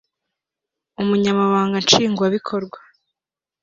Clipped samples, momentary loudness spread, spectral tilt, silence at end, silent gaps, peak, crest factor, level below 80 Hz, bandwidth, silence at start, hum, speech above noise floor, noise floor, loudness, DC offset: under 0.1%; 12 LU; -4 dB/octave; 0.85 s; none; 0 dBFS; 20 dB; -60 dBFS; 7.6 kHz; 1 s; none; 71 dB; -89 dBFS; -18 LUFS; under 0.1%